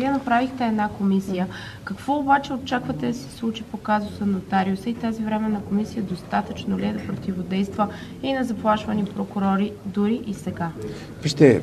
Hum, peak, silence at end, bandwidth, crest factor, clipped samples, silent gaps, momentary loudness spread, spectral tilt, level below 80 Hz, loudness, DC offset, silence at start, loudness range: none; 0 dBFS; 0 s; 13.5 kHz; 22 dB; under 0.1%; none; 8 LU; -6.5 dB/octave; -50 dBFS; -24 LUFS; under 0.1%; 0 s; 2 LU